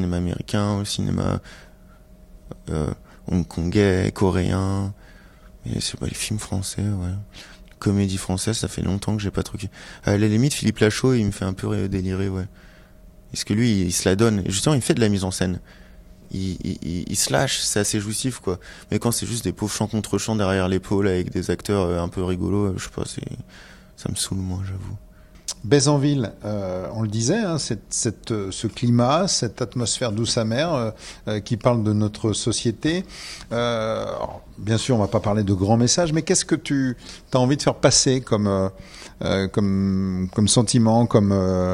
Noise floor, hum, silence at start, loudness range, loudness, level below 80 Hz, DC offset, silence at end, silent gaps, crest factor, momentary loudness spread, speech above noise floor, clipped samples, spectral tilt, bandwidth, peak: -48 dBFS; none; 0 s; 5 LU; -22 LUFS; -46 dBFS; under 0.1%; 0 s; none; 20 dB; 12 LU; 26 dB; under 0.1%; -5 dB/octave; 15 kHz; -2 dBFS